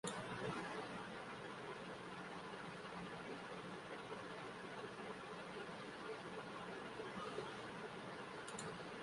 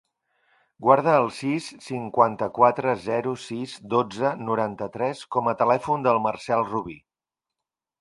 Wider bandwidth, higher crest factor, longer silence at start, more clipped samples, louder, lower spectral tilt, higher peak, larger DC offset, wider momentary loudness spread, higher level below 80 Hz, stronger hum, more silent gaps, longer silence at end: about the same, 11.5 kHz vs 11.5 kHz; about the same, 20 dB vs 22 dB; second, 0.05 s vs 0.8 s; neither; second, -50 LUFS vs -24 LUFS; second, -4 dB/octave vs -6.5 dB/octave; second, -30 dBFS vs -2 dBFS; neither; second, 4 LU vs 11 LU; second, -76 dBFS vs -64 dBFS; neither; neither; second, 0 s vs 1 s